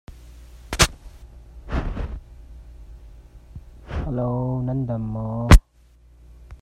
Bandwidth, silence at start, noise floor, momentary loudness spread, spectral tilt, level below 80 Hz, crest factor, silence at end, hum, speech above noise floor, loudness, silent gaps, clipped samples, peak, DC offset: 16 kHz; 0.1 s; -53 dBFS; 29 LU; -5 dB/octave; -26 dBFS; 24 dB; 0.05 s; none; 35 dB; -23 LUFS; none; under 0.1%; 0 dBFS; under 0.1%